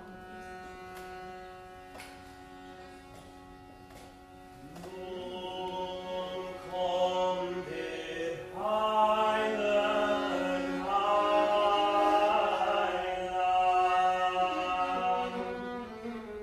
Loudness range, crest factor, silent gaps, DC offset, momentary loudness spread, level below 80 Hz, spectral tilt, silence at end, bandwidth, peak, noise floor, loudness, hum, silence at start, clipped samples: 20 LU; 18 dB; none; under 0.1%; 23 LU; -60 dBFS; -4.5 dB/octave; 0 s; 14.5 kHz; -14 dBFS; -51 dBFS; -30 LUFS; none; 0 s; under 0.1%